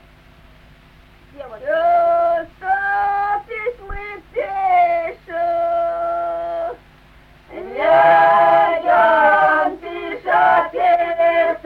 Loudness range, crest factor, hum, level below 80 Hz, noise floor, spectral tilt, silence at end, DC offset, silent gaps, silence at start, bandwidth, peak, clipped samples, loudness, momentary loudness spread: 6 LU; 14 dB; none; -46 dBFS; -47 dBFS; -5.5 dB/octave; 0.1 s; under 0.1%; none; 1.35 s; 5.2 kHz; -2 dBFS; under 0.1%; -16 LUFS; 16 LU